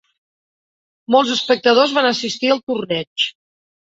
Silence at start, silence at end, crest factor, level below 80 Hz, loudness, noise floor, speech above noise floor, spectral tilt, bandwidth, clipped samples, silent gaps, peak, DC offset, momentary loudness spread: 1.1 s; 0.65 s; 18 dB; -64 dBFS; -17 LUFS; under -90 dBFS; over 73 dB; -3.5 dB/octave; 8 kHz; under 0.1%; 2.63-2.67 s, 3.07-3.16 s; -2 dBFS; under 0.1%; 8 LU